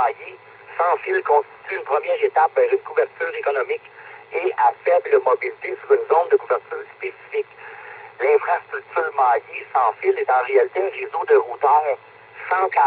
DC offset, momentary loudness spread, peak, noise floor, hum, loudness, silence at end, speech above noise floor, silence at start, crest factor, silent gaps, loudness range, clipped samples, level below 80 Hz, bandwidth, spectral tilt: under 0.1%; 14 LU; -4 dBFS; -39 dBFS; none; -20 LUFS; 0 s; 19 dB; 0 s; 16 dB; none; 3 LU; under 0.1%; -76 dBFS; 4.6 kHz; -8 dB/octave